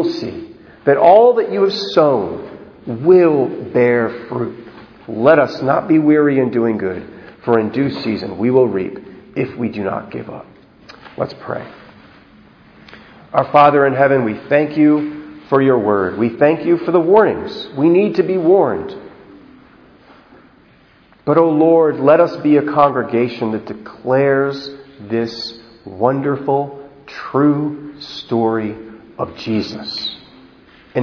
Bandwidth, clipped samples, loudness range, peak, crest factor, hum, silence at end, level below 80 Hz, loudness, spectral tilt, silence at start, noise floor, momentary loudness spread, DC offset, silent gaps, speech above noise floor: 5.4 kHz; under 0.1%; 7 LU; 0 dBFS; 16 dB; none; 0 s; -56 dBFS; -15 LUFS; -8 dB/octave; 0 s; -49 dBFS; 18 LU; under 0.1%; none; 35 dB